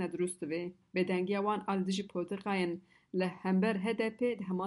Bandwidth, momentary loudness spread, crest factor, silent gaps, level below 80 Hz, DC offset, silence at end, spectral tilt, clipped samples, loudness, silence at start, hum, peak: 11.5 kHz; 7 LU; 14 dB; none; -76 dBFS; under 0.1%; 0 s; -6 dB/octave; under 0.1%; -34 LUFS; 0 s; none; -20 dBFS